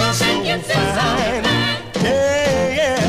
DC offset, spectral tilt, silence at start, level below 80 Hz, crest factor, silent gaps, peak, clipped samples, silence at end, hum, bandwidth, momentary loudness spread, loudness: under 0.1%; -4 dB/octave; 0 s; -38 dBFS; 12 dB; none; -6 dBFS; under 0.1%; 0 s; none; 15.5 kHz; 3 LU; -17 LUFS